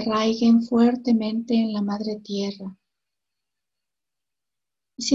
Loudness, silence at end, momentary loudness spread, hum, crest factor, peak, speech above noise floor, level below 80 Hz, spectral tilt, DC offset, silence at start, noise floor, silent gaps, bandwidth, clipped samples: -22 LUFS; 0 s; 12 LU; none; 18 dB; -6 dBFS; 67 dB; -64 dBFS; -5.5 dB/octave; under 0.1%; 0 s; -88 dBFS; none; 7.8 kHz; under 0.1%